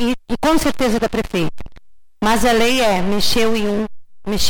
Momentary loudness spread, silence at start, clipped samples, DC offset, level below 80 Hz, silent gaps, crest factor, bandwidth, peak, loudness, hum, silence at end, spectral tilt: 10 LU; 0 s; under 0.1%; under 0.1%; -34 dBFS; none; 14 dB; over 20 kHz; -4 dBFS; -17 LUFS; none; 0 s; -4 dB/octave